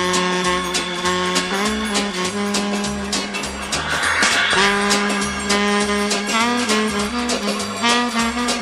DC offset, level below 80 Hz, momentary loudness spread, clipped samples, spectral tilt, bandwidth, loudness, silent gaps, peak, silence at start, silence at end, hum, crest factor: under 0.1%; -42 dBFS; 7 LU; under 0.1%; -2.5 dB/octave; 14 kHz; -18 LUFS; none; -2 dBFS; 0 s; 0 s; none; 18 dB